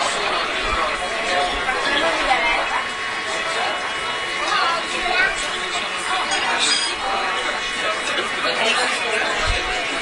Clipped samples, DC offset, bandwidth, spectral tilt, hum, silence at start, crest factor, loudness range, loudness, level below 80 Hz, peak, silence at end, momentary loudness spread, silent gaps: under 0.1%; under 0.1%; 11 kHz; -1 dB/octave; none; 0 s; 18 dB; 1 LU; -20 LUFS; -40 dBFS; -4 dBFS; 0 s; 5 LU; none